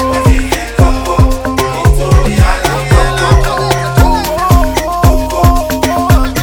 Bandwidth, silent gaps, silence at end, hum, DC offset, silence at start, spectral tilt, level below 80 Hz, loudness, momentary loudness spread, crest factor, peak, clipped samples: over 20 kHz; none; 0 s; none; under 0.1%; 0 s; -5.5 dB/octave; -14 dBFS; -11 LUFS; 3 LU; 10 dB; 0 dBFS; 0.8%